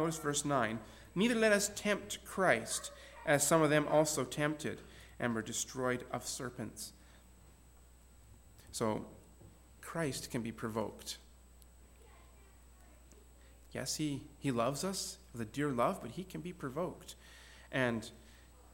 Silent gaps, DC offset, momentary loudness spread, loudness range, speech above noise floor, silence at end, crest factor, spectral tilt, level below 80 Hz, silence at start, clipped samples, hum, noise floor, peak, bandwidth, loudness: none; under 0.1%; 17 LU; 13 LU; 25 dB; 0 s; 22 dB; -4 dB/octave; -60 dBFS; 0 s; under 0.1%; none; -60 dBFS; -16 dBFS; 17 kHz; -36 LUFS